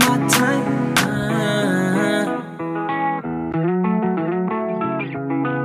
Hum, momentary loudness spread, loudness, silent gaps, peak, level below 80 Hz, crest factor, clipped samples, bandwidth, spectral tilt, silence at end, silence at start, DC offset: none; 8 LU; -20 LUFS; none; -2 dBFS; -54 dBFS; 18 dB; under 0.1%; 16.5 kHz; -5 dB/octave; 0 s; 0 s; under 0.1%